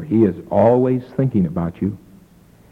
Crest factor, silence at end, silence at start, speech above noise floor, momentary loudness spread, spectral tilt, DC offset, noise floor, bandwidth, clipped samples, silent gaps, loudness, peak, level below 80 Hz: 16 dB; 0.75 s; 0 s; 32 dB; 11 LU; -11 dB/octave; under 0.1%; -49 dBFS; 5.4 kHz; under 0.1%; none; -18 LUFS; -2 dBFS; -48 dBFS